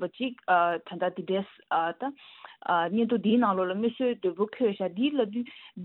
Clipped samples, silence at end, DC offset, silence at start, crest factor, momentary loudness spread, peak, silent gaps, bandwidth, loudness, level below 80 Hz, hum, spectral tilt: under 0.1%; 0 s; under 0.1%; 0 s; 18 dB; 12 LU; -10 dBFS; none; 4.2 kHz; -28 LUFS; -76 dBFS; none; -9.5 dB/octave